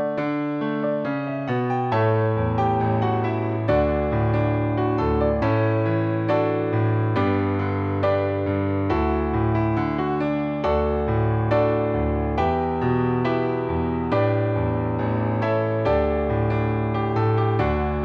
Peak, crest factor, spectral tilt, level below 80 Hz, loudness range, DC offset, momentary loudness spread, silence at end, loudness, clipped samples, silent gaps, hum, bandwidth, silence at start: -8 dBFS; 14 dB; -10 dB/octave; -36 dBFS; 1 LU; under 0.1%; 3 LU; 0 s; -22 LUFS; under 0.1%; none; none; 5.4 kHz; 0 s